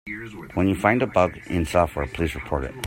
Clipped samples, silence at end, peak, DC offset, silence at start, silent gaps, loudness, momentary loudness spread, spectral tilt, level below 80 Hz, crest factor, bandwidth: under 0.1%; 0 s; -4 dBFS; under 0.1%; 0.05 s; none; -23 LUFS; 10 LU; -6.5 dB/octave; -40 dBFS; 20 dB; 16.5 kHz